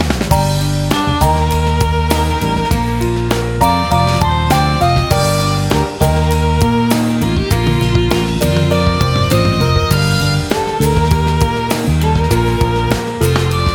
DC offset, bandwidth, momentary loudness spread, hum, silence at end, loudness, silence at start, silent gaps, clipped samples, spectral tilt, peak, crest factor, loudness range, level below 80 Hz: under 0.1%; 19.5 kHz; 3 LU; none; 0 s; -14 LUFS; 0 s; none; under 0.1%; -5.5 dB/octave; 0 dBFS; 14 dB; 1 LU; -22 dBFS